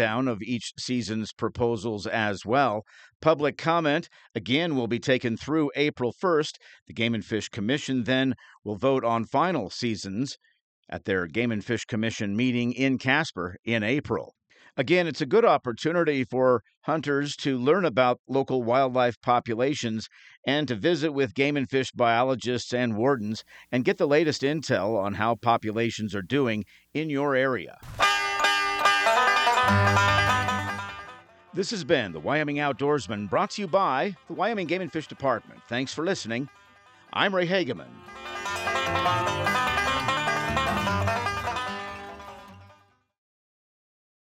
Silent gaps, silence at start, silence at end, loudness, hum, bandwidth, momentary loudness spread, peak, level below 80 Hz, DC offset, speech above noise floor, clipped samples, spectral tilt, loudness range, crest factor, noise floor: 3.15-3.20 s, 6.82-6.86 s, 10.61-10.83 s, 13.59-13.63 s, 16.77-16.81 s, 18.19-18.25 s, 19.17-19.21 s, 20.37-20.43 s; 0 s; 1.6 s; -26 LUFS; none; 16 kHz; 11 LU; -8 dBFS; -58 dBFS; under 0.1%; 33 dB; under 0.1%; -5 dB/octave; 6 LU; 18 dB; -59 dBFS